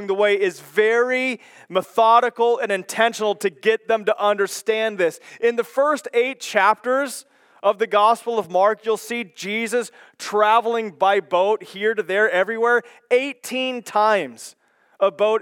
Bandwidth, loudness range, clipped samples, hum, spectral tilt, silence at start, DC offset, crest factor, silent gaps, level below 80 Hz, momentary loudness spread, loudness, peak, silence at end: 17.5 kHz; 2 LU; under 0.1%; none; -3 dB/octave; 0 s; under 0.1%; 18 dB; none; under -90 dBFS; 8 LU; -20 LUFS; -2 dBFS; 0 s